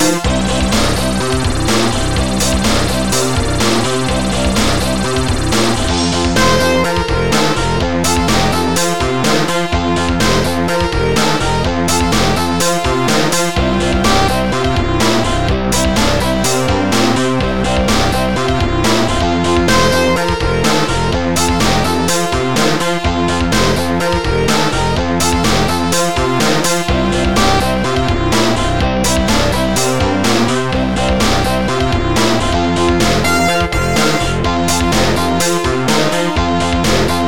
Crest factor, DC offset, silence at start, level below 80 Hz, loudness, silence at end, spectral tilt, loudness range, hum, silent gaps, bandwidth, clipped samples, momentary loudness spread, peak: 12 dB; 5%; 0 s; -24 dBFS; -14 LUFS; 0 s; -4 dB/octave; 1 LU; none; none; 19 kHz; under 0.1%; 3 LU; -2 dBFS